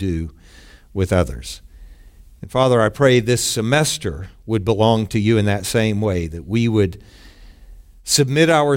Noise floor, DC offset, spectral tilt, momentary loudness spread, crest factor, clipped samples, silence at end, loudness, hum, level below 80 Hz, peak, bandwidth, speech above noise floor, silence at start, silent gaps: -44 dBFS; under 0.1%; -5 dB/octave; 15 LU; 18 dB; under 0.1%; 0 s; -18 LUFS; none; -40 dBFS; -2 dBFS; 16.5 kHz; 26 dB; 0 s; none